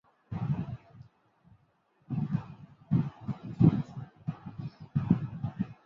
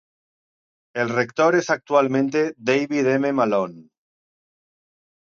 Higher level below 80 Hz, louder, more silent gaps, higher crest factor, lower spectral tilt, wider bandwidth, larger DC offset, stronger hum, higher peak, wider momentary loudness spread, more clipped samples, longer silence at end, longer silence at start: first, -56 dBFS vs -70 dBFS; second, -32 LUFS vs -21 LUFS; neither; first, 24 dB vs 18 dB; first, -11 dB/octave vs -5.5 dB/octave; second, 5.6 kHz vs 7.4 kHz; neither; neither; second, -10 dBFS vs -4 dBFS; first, 17 LU vs 6 LU; neither; second, 0.1 s vs 1.45 s; second, 0.3 s vs 0.95 s